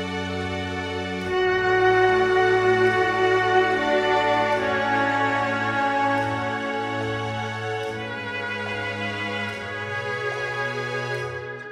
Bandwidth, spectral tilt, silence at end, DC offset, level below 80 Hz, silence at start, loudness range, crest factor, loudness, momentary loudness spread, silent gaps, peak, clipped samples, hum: 11 kHz; -5.5 dB/octave; 0 s; under 0.1%; -54 dBFS; 0 s; 8 LU; 16 dB; -23 LUFS; 9 LU; none; -8 dBFS; under 0.1%; none